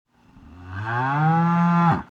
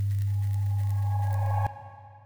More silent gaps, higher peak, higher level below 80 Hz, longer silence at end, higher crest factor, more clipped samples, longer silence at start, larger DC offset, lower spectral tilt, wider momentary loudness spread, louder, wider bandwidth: neither; first, -8 dBFS vs -16 dBFS; about the same, -52 dBFS vs -56 dBFS; about the same, 0.05 s vs 0 s; about the same, 14 dB vs 12 dB; neither; first, 0.5 s vs 0 s; second, under 0.1% vs 0.2%; first, -9 dB/octave vs -7.5 dB/octave; first, 13 LU vs 8 LU; first, -20 LUFS vs -28 LUFS; first, 6.6 kHz vs 4.4 kHz